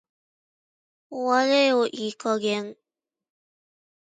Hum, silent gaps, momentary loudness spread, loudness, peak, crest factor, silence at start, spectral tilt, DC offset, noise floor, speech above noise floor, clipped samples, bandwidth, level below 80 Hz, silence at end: none; none; 13 LU; -23 LUFS; -8 dBFS; 20 dB; 1.1 s; -3.5 dB/octave; under 0.1%; under -90 dBFS; over 67 dB; under 0.1%; 9.4 kHz; -80 dBFS; 1.3 s